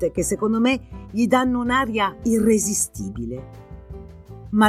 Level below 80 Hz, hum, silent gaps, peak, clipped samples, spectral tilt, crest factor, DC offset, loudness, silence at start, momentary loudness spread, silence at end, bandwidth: -42 dBFS; none; none; -4 dBFS; under 0.1%; -4 dB/octave; 18 dB; under 0.1%; -21 LUFS; 0 s; 22 LU; 0 s; 15 kHz